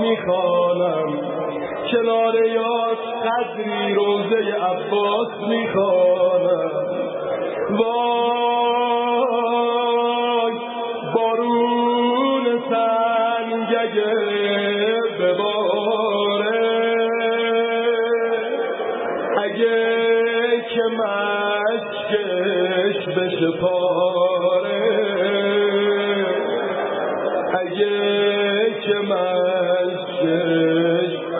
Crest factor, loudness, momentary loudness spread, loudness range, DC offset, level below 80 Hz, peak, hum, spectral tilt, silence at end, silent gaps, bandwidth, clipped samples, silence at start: 16 dB; -20 LUFS; 5 LU; 1 LU; under 0.1%; -68 dBFS; -4 dBFS; none; -10 dB/octave; 0 s; none; 4 kHz; under 0.1%; 0 s